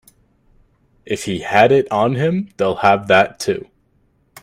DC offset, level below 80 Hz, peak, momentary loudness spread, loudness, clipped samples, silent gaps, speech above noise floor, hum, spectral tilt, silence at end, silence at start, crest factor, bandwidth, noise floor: under 0.1%; -54 dBFS; 0 dBFS; 11 LU; -16 LUFS; under 0.1%; none; 44 dB; none; -5.5 dB/octave; 0.8 s; 1.05 s; 18 dB; 15.5 kHz; -60 dBFS